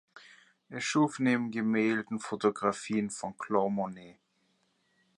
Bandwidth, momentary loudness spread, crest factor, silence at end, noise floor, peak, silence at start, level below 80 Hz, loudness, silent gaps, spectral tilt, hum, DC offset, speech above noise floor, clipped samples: 11 kHz; 10 LU; 20 dB; 1.05 s; -73 dBFS; -12 dBFS; 0.15 s; -76 dBFS; -31 LUFS; none; -5 dB/octave; none; under 0.1%; 43 dB; under 0.1%